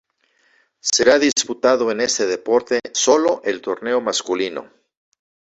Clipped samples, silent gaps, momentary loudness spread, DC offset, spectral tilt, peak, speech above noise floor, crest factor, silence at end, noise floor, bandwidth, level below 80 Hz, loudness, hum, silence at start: under 0.1%; none; 9 LU; under 0.1%; -1.5 dB/octave; 0 dBFS; 44 dB; 18 dB; 0.85 s; -62 dBFS; 8.4 kHz; -60 dBFS; -18 LUFS; none; 0.85 s